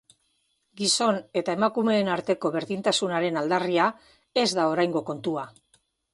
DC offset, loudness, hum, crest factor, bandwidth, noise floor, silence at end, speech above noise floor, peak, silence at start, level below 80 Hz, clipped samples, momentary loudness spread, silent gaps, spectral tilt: under 0.1%; -25 LUFS; none; 18 dB; 11.5 kHz; -72 dBFS; 0.65 s; 47 dB; -8 dBFS; 0.75 s; -70 dBFS; under 0.1%; 7 LU; none; -3.5 dB/octave